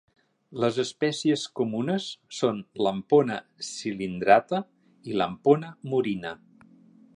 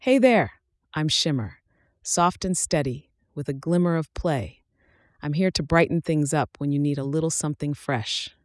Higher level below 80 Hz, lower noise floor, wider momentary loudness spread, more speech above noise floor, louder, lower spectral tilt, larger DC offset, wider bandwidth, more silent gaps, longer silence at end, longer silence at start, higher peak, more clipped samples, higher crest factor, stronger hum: second, -66 dBFS vs -48 dBFS; second, -55 dBFS vs -63 dBFS; about the same, 14 LU vs 13 LU; second, 29 dB vs 39 dB; about the same, -26 LUFS vs -24 LUFS; about the same, -5.5 dB/octave vs -4.5 dB/octave; neither; about the same, 11 kHz vs 12 kHz; neither; first, 0.8 s vs 0.15 s; first, 0.5 s vs 0 s; about the same, -4 dBFS vs -6 dBFS; neither; first, 24 dB vs 18 dB; neither